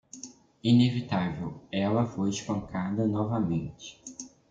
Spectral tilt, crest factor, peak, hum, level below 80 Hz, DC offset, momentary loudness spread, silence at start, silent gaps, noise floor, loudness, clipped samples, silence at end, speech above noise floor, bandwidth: -6.5 dB/octave; 18 dB; -10 dBFS; none; -58 dBFS; under 0.1%; 20 LU; 0.15 s; none; -49 dBFS; -28 LUFS; under 0.1%; 0.25 s; 21 dB; 8.6 kHz